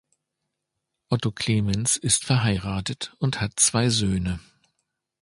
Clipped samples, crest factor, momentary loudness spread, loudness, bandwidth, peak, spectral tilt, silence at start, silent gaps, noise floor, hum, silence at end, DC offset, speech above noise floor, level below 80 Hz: under 0.1%; 20 dB; 9 LU; -23 LUFS; 11.5 kHz; -4 dBFS; -3.5 dB/octave; 1.1 s; none; -81 dBFS; none; 0.8 s; under 0.1%; 58 dB; -46 dBFS